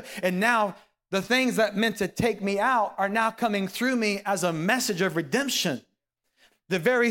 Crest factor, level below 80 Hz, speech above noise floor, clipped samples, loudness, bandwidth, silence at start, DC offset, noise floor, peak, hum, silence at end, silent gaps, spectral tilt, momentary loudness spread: 18 dB; -62 dBFS; 52 dB; under 0.1%; -25 LUFS; 17.5 kHz; 0 s; under 0.1%; -77 dBFS; -8 dBFS; none; 0 s; none; -4 dB/octave; 6 LU